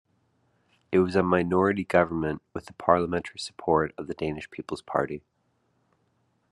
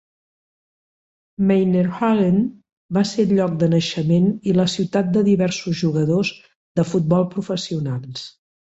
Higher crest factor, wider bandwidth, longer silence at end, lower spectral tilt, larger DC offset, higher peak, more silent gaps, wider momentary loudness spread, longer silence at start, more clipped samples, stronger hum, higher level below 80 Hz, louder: first, 22 dB vs 14 dB; first, 11 kHz vs 8 kHz; first, 1.35 s vs 0.45 s; about the same, -6.5 dB/octave vs -7 dB/octave; neither; about the same, -6 dBFS vs -6 dBFS; second, none vs 2.72-2.89 s, 6.55-6.75 s; first, 13 LU vs 9 LU; second, 0.9 s vs 1.4 s; neither; neither; about the same, -58 dBFS vs -56 dBFS; second, -26 LUFS vs -19 LUFS